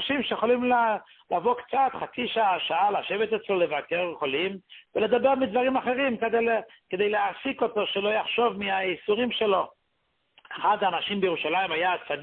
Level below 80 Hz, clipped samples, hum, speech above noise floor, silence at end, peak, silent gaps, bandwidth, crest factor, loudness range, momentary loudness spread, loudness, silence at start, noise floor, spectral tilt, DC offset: -66 dBFS; under 0.1%; none; 48 dB; 0 s; -10 dBFS; none; 4.4 kHz; 16 dB; 1 LU; 5 LU; -26 LUFS; 0 s; -74 dBFS; -8.5 dB/octave; under 0.1%